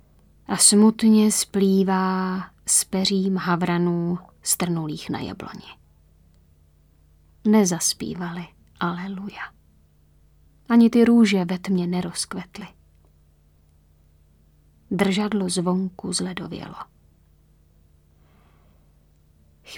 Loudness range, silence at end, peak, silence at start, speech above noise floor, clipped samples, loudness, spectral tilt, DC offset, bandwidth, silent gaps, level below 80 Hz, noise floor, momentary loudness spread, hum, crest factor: 10 LU; 0 s; -2 dBFS; 0.5 s; 36 dB; under 0.1%; -21 LUFS; -4.5 dB/octave; under 0.1%; 18 kHz; none; -56 dBFS; -57 dBFS; 20 LU; none; 22 dB